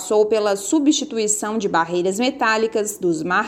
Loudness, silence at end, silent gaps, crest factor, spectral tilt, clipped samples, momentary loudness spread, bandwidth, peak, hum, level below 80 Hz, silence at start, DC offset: -19 LUFS; 0 s; none; 14 dB; -3 dB/octave; under 0.1%; 4 LU; 16.5 kHz; -4 dBFS; none; -60 dBFS; 0 s; under 0.1%